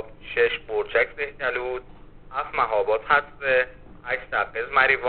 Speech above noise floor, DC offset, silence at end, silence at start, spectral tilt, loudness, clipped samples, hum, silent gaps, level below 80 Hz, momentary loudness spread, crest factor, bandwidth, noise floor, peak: 22 dB; 0.3%; 0 s; 0 s; -0.5 dB/octave; -24 LUFS; under 0.1%; none; none; -48 dBFS; 11 LU; 20 dB; 4.6 kHz; -45 dBFS; -4 dBFS